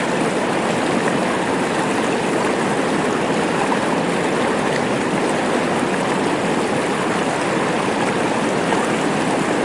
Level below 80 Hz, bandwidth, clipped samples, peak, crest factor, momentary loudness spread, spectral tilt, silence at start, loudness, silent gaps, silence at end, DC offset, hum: -52 dBFS; 11.5 kHz; under 0.1%; -4 dBFS; 16 dB; 1 LU; -4.5 dB/octave; 0 s; -19 LUFS; none; 0 s; 0.1%; none